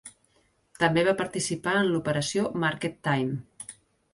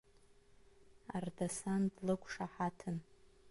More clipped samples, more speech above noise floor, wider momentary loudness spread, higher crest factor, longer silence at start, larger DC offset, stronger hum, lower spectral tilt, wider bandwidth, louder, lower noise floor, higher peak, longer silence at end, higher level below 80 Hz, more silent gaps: neither; first, 41 dB vs 26 dB; first, 12 LU vs 9 LU; about the same, 20 dB vs 18 dB; second, 0.05 s vs 0.9 s; neither; neither; second, -4.5 dB/octave vs -6 dB/octave; about the same, 11.5 kHz vs 11.5 kHz; first, -27 LUFS vs -41 LUFS; about the same, -67 dBFS vs -66 dBFS; first, -8 dBFS vs -24 dBFS; first, 0.4 s vs 0 s; first, -62 dBFS vs -68 dBFS; neither